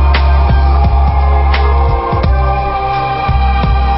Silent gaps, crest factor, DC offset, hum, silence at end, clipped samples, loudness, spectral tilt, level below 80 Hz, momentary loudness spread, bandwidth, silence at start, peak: none; 10 dB; under 0.1%; none; 0 s; under 0.1%; -12 LUFS; -11.5 dB/octave; -12 dBFS; 4 LU; 5.8 kHz; 0 s; 0 dBFS